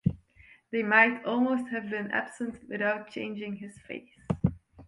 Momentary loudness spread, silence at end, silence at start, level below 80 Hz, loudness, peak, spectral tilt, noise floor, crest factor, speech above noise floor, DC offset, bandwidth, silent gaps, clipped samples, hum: 20 LU; 0.05 s; 0.05 s; -54 dBFS; -29 LUFS; -8 dBFS; -7 dB/octave; -58 dBFS; 24 dB; 29 dB; under 0.1%; 11 kHz; none; under 0.1%; none